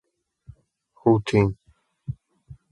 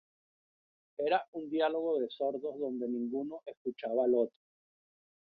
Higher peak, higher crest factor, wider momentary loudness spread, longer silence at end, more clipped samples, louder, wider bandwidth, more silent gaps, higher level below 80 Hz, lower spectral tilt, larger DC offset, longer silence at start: first, -6 dBFS vs -18 dBFS; about the same, 22 dB vs 18 dB; first, 21 LU vs 11 LU; second, 0.2 s vs 1.1 s; neither; first, -22 LUFS vs -34 LUFS; first, 11 kHz vs 4.9 kHz; second, none vs 1.28-1.33 s, 3.57-3.65 s; first, -48 dBFS vs -84 dBFS; first, -8 dB/octave vs -3 dB/octave; neither; about the same, 1.05 s vs 1 s